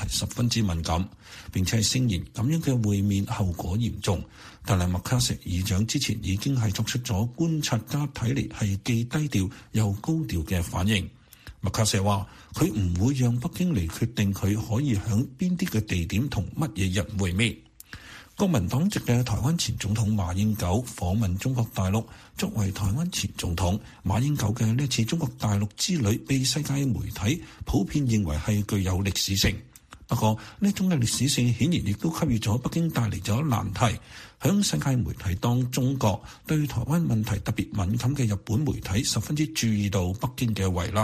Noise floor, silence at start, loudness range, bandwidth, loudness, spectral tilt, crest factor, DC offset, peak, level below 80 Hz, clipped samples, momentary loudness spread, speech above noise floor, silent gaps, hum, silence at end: -45 dBFS; 0 s; 2 LU; 15.5 kHz; -26 LUFS; -5 dB/octave; 20 dB; under 0.1%; -6 dBFS; -44 dBFS; under 0.1%; 5 LU; 20 dB; none; none; 0 s